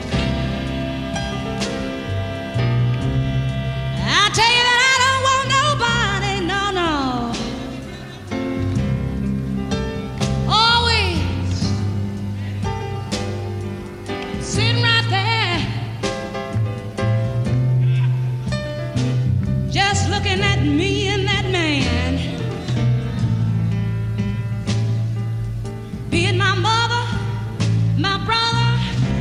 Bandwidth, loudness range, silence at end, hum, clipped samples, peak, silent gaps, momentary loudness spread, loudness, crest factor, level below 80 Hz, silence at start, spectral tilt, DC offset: 12 kHz; 7 LU; 0 s; none; under 0.1%; -2 dBFS; none; 11 LU; -19 LUFS; 18 dB; -34 dBFS; 0 s; -5 dB/octave; under 0.1%